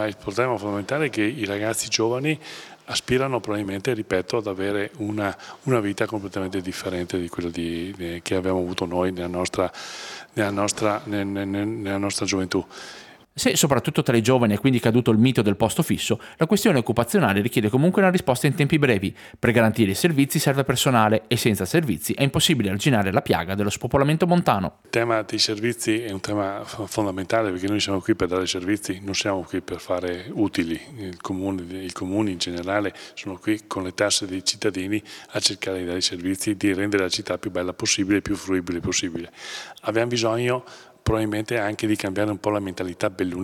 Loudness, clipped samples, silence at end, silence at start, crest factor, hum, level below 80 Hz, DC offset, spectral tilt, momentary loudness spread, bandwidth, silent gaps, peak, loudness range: -23 LUFS; under 0.1%; 0 s; 0 s; 22 dB; none; -52 dBFS; under 0.1%; -4.5 dB/octave; 10 LU; 19.5 kHz; none; 0 dBFS; 6 LU